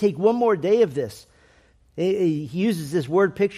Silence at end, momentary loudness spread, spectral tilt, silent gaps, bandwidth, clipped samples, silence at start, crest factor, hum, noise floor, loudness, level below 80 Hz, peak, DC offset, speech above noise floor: 0 s; 9 LU; -7 dB/octave; none; 14.5 kHz; under 0.1%; 0 s; 16 dB; none; -57 dBFS; -22 LUFS; -60 dBFS; -6 dBFS; under 0.1%; 36 dB